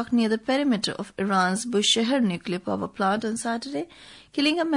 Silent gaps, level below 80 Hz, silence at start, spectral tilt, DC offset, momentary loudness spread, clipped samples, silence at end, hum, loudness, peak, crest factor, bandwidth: none; -64 dBFS; 0 s; -4 dB/octave; under 0.1%; 9 LU; under 0.1%; 0 s; none; -25 LUFS; -10 dBFS; 16 dB; 11 kHz